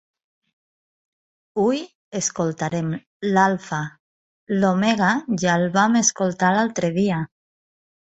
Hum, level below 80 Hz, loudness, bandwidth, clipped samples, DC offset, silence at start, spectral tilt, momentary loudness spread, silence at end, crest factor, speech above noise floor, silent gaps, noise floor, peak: none; -62 dBFS; -21 LUFS; 8.2 kHz; under 0.1%; under 0.1%; 1.55 s; -4.5 dB/octave; 10 LU; 0.75 s; 20 dB; over 70 dB; 1.95-2.12 s, 3.07-3.20 s, 4.00-4.47 s; under -90 dBFS; -4 dBFS